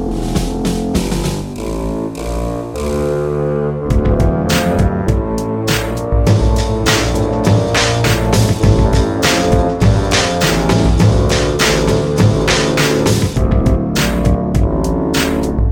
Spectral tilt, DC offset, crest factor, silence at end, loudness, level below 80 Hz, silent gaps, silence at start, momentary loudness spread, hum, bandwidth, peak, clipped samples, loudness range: -5.5 dB/octave; 0.2%; 14 dB; 0 s; -14 LUFS; -20 dBFS; none; 0 s; 7 LU; none; 19 kHz; 0 dBFS; under 0.1%; 5 LU